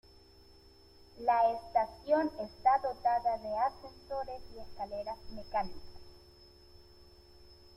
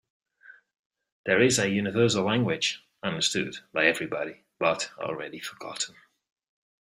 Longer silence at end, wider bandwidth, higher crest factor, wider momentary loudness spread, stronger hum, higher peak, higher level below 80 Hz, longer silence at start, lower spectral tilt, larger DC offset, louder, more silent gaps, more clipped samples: second, 0.3 s vs 0.95 s; second, 13.5 kHz vs 16 kHz; about the same, 20 dB vs 22 dB; about the same, 15 LU vs 13 LU; neither; second, -16 dBFS vs -6 dBFS; first, -58 dBFS vs -66 dBFS; first, 1.15 s vs 0.5 s; first, -6 dB/octave vs -3.5 dB/octave; neither; second, -33 LUFS vs -27 LUFS; second, none vs 0.79-0.90 s, 1.12-1.24 s; neither